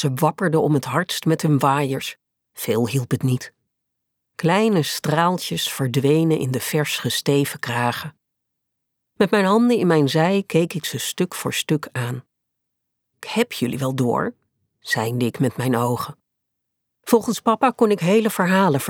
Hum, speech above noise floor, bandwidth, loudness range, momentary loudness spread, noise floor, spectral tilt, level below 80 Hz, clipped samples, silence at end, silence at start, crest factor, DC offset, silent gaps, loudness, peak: none; 59 dB; 19.5 kHz; 5 LU; 10 LU; -78 dBFS; -5.5 dB/octave; -66 dBFS; under 0.1%; 0 s; 0 s; 18 dB; under 0.1%; none; -20 LUFS; -4 dBFS